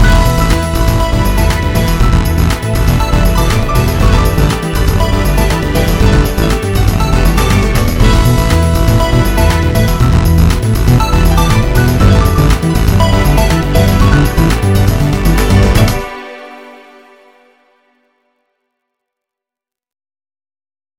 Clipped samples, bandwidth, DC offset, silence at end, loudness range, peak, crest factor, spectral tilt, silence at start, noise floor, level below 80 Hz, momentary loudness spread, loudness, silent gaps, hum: under 0.1%; 17 kHz; under 0.1%; 4.25 s; 3 LU; 0 dBFS; 10 dB; -6 dB/octave; 0 s; -86 dBFS; -14 dBFS; 3 LU; -11 LUFS; none; none